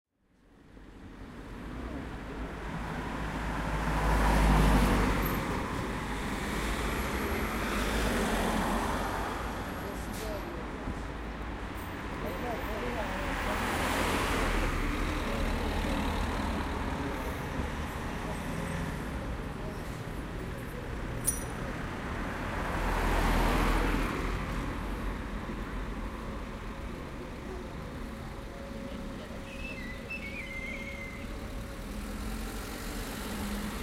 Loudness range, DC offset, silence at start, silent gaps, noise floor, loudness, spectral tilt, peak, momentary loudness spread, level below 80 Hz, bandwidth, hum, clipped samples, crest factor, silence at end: 10 LU; under 0.1%; 0.6 s; none; -64 dBFS; -34 LUFS; -5 dB/octave; -12 dBFS; 12 LU; -36 dBFS; 16 kHz; none; under 0.1%; 20 dB; 0 s